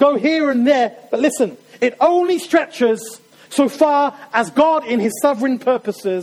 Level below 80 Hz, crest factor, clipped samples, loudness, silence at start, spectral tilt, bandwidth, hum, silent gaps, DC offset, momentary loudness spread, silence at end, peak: -64 dBFS; 14 dB; under 0.1%; -17 LUFS; 0 s; -4.5 dB/octave; 16.5 kHz; none; none; under 0.1%; 6 LU; 0 s; -2 dBFS